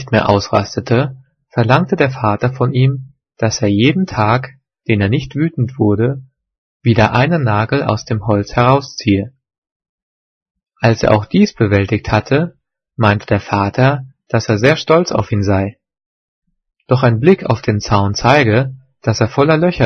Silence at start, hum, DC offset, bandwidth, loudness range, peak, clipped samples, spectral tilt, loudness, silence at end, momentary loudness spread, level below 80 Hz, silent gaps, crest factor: 0 s; none; under 0.1%; 6.6 kHz; 2 LU; 0 dBFS; under 0.1%; -6.5 dB/octave; -14 LUFS; 0 s; 7 LU; -42 dBFS; 6.58-6.80 s, 9.58-9.62 s, 9.71-9.80 s, 9.89-10.55 s, 16.06-16.42 s; 14 dB